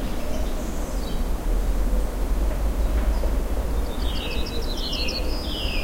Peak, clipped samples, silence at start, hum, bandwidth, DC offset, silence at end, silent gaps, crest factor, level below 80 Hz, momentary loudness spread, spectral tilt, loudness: -10 dBFS; under 0.1%; 0 s; none; 16 kHz; under 0.1%; 0 s; none; 12 dB; -24 dBFS; 4 LU; -5 dB/octave; -28 LUFS